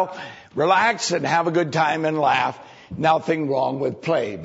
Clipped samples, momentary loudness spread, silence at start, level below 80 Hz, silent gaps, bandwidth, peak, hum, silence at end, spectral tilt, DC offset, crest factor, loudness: under 0.1%; 9 LU; 0 s; -62 dBFS; none; 8 kHz; -6 dBFS; none; 0 s; -4.5 dB/octave; under 0.1%; 16 dB; -21 LUFS